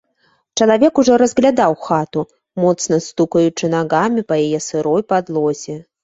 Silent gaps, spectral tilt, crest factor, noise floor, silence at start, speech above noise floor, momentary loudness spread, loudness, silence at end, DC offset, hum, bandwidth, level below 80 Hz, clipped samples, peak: none; -5 dB/octave; 14 dB; -61 dBFS; 0.55 s; 45 dB; 10 LU; -16 LUFS; 0.2 s; under 0.1%; none; 8 kHz; -56 dBFS; under 0.1%; 0 dBFS